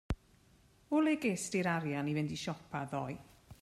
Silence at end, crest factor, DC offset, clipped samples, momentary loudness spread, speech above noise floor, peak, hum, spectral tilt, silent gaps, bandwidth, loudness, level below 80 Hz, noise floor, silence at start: 0.1 s; 16 dB; under 0.1%; under 0.1%; 12 LU; 31 dB; -20 dBFS; none; -5.5 dB/octave; none; 13.5 kHz; -36 LUFS; -54 dBFS; -66 dBFS; 0.1 s